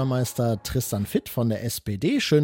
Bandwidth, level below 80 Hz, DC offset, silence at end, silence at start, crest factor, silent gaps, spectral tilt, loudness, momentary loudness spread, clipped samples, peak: 17 kHz; -48 dBFS; under 0.1%; 0 s; 0 s; 16 dB; none; -5.5 dB/octave; -26 LUFS; 3 LU; under 0.1%; -8 dBFS